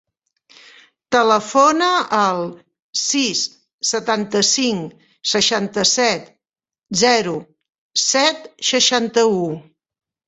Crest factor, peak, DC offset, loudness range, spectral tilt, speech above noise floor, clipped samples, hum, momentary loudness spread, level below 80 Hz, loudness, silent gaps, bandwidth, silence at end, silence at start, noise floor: 18 dB; -2 dBFS; under 0.1%; 1 LU; -2 dB/octave; 71 dB; under 0.1%; none; 11 LU; -62 dBFS; -17 LUFS; 2.82-2.93 s, 3.74-3.79 s, 7.78-7.90 s; 8.4 kHz; 0.65 s; 1.1 s; -88 dBFS